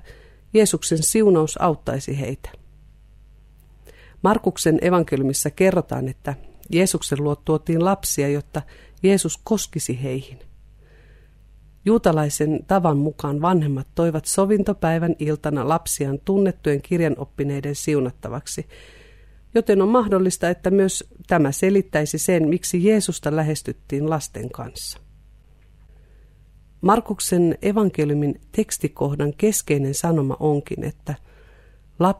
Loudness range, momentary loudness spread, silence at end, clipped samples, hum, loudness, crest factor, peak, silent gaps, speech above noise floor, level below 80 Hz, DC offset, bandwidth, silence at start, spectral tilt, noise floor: 5 LU; 12 LU; 0 s; under 0.1%; none; -21 LUFS; 18 dB; -4 dBFS; none; 30 dB; -46 dBFS; under 0.1%; 15.5 kHz; 0.05 s; -5.5 dB/octave; -50 dBFS